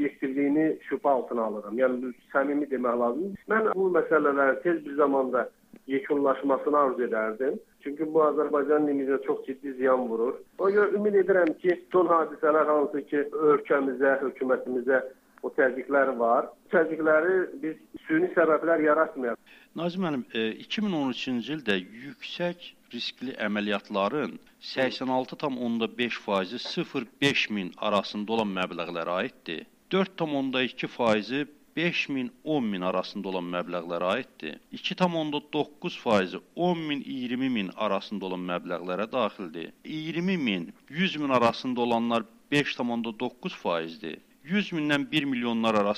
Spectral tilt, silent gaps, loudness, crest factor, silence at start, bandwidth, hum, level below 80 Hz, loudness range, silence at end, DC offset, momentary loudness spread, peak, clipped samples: -6 dB/octave; none; -27 LUFS; 20 dB; 0 s; 15 kHz; none; -72 dBFS; 6 LU; 0 s; under 0.1%; 10 LU; -8 dBFS; under 0.1%